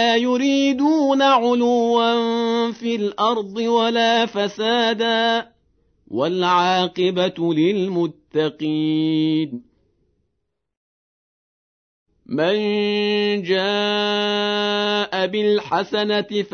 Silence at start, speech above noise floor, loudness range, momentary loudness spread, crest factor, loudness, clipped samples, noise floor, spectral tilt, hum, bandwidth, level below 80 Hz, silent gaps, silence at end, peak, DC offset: 0 s; 57 dB; 7 LU; 6 LU; 14 dB; -19 LUFS; under 0.1%; -76 dBFS; -5 dB/octave; none; 6.6 kHz; -66 dBFS; 10.77-12.06 s; 0.05 s; -6 dBFS; under 0.1%